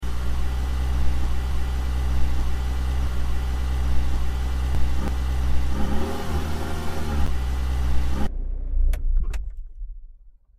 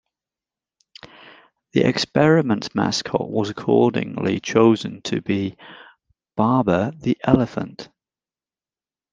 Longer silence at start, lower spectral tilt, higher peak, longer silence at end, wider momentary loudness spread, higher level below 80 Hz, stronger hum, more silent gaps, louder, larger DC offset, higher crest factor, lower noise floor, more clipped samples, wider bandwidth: second, 0 s vs 1.75 s; about the same, -6 dB/octave vs -6 dB/octave; second, -8 dBFS vs -2 dBFS; second, 0.3 s vs 1.3 s; second, 5 LU vs 10 LU; first, -24 dBFS vs -54 dBFS; neither; neither; second, -27 LUFS vs -20 LUFS; neither; second, 12 dB vs 20 dB; second, -47 dBFS vs under -90 dBFS; neither; first, 14 kHz vs 9.6 kHz